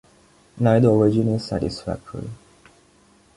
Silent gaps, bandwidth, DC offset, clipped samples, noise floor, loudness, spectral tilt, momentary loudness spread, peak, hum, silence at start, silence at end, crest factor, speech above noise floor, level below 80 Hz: none; 11.5 kHz; under 0.1%; under 0.1%; -56 dBFS; -20 LUFS; -8 dB/octave; 19 LU; -4 dBFS; none; 0.55 s; 1 s; 18 dB; 36 dB; -48 dBFS